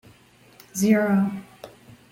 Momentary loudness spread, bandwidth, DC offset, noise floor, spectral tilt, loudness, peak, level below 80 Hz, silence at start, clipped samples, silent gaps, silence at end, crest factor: 24 LU; 16.5 kHz; under 0.1%; -54 dBFS; -6 dB/octave; -22 LUFS; -6 dBFS; -64 dBFS; 0.75 s; under 0.1%; none; 0.45 s; 18 dB